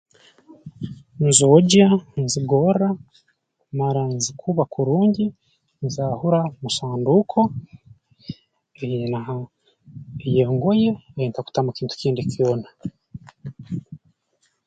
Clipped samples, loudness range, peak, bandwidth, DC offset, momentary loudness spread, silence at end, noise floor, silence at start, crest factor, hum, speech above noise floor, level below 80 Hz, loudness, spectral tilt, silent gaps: under 0.1%; 8 LU; 0 dBFS; 9.4 kHz; under 0.1%; 20 LU; 0.7 s; -68 dBFS; 0.65 s; 22 dB; none; 48 dB; -56 dBFS; -20 LUFS; -5.5 dB/octave; none